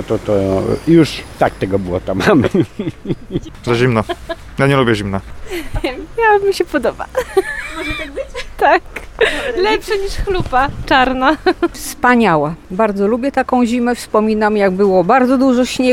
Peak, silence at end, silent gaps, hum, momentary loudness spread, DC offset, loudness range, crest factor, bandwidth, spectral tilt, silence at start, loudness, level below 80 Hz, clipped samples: 0 dBFS; 0 s; none; none; 11 LU; under 0.1%; 4 LU; 14 dB; 16.5 kHz; -6 dB/octave; 0 s; -15 LUFS; -32 dBFS; under 0.1%